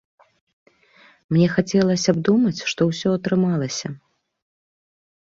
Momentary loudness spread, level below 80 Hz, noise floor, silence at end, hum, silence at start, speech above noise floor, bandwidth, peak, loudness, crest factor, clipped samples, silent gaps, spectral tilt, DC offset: 9 LU; -58 dBFS; -54 dBFS; 1.4 s; none; 1.3 s; 34 dB; 7.8 kHz; -4 dBFS; -20 LUFS; 18 dB; under 0.1%; none; -6 dB/octave; under 0.1%